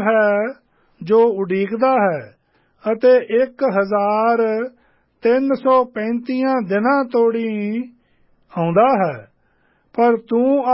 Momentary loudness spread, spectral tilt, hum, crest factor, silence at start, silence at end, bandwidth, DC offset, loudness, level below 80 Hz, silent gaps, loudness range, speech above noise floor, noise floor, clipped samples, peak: 12 LU; -11.5 dB/octave; none; 14 dB; 0 s; 0 s; 5.8 kHz; under 0.1%; -17 LUFS; -70 dBFS; none; 2 LU; 44 dB; -60 dBFS; under 0.1%; -4 dBFS